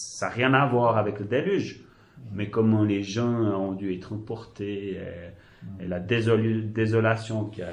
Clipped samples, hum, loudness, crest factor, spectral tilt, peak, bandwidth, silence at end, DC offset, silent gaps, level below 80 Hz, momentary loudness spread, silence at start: under 0.1%; none; -26 LUFS; 20 dB; -6.5 dB/octave; -6 dBFS; 11 kHz; 0 s; under 0.1%; none; -54 dBFS; 16 LU; 0 s